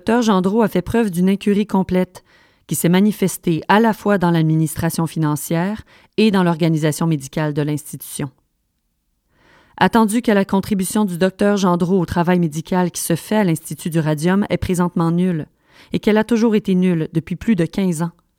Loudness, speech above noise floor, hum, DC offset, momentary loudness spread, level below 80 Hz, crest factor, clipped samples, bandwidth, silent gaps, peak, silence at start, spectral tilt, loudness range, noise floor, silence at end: -18 LUFS; 52 dB; none; under 0.1%; 8 LU; -46 dBFS; 18 dB; under 0.1%; 16.5 kHz; none; 0 dBFS; 0.05 s; -6 dB/octave; 3 LU; -69 dBFS; 0.3 s